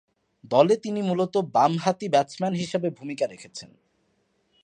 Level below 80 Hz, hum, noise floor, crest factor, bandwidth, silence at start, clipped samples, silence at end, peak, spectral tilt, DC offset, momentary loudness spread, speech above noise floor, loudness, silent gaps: -72 dBFS; none; -70 dBFS; 20 dB; 10.5 kHz; 0.5 s; under 0.1%; 1 s; -4 dBFS; -6 dB/octave; under 0.1%; 10 LU; 46 dB; -24 LUFS; none